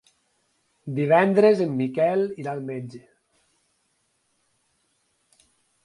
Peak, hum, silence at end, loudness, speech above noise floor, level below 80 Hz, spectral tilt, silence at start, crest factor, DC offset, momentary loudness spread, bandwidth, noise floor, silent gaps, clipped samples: -4 dBFS; none; 2.85 s; -22 LUFS; 49 dB; -72 dBFS; -8 dB/octave; 0.85 s; 20 dB; under 0.1%; 17 LU; 11 kHz; -71 dBFS; none; under 0.1%